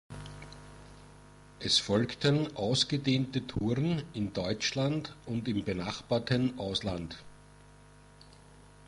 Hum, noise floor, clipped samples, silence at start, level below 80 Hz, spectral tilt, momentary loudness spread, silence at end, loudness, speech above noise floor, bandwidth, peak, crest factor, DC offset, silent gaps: 50 Hz at -55 dBFS; -56 dBFS; under 0.1%; 0.1 s; -56 dBFS; -5 dB/octave; 19 LU; 0 s; -31 LUFS; 25 dB; 11.5 kHz; -14 dBFS; 20 dB; under 0.1%; none